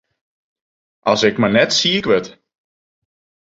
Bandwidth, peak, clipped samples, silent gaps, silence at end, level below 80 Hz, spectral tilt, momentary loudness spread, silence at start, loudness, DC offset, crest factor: 8 kHz; -2 dBFS; under 0.1%; none; 1.1 s; -54 dBFS; -3.5 dB/octave; 8 LU; 1.05 s; -15 LUFS; under 0.1%; 18 dB